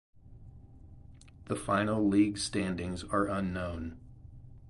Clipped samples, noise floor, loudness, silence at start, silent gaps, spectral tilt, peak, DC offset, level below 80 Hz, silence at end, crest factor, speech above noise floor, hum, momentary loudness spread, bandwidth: under 0.1%; -53 dBFS; -31 LUFS; 0.25 s; none; -5.5 dB/octave; -16 dBFS; under 0.1%; -52 dBFS; 0 s; 18 dB; 22 dB; none; 25 LU; 11.5 kHz